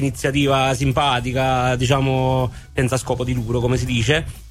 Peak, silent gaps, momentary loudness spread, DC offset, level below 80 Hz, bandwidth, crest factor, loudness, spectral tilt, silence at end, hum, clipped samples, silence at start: -4 dBFS; none; 5 LU; under 0.1%; -34 dBFS; 14.5 kHz; 16 dB; -19 LUFS; -5.5 dB/octave; 0 s; none; under 0.1%; 0 s